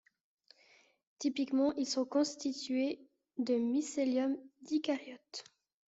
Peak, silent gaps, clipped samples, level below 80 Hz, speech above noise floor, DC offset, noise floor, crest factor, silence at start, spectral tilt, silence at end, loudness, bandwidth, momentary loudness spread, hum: -22 dBFS; none; under 0.1%; -80 dBFS; 33 dB; under 0.1%; -67 dBFS; 14 dB; 1.2 s; -3 dB/octave; 0.45 s; -35 LUFS; 8 kHz; 15 LU; none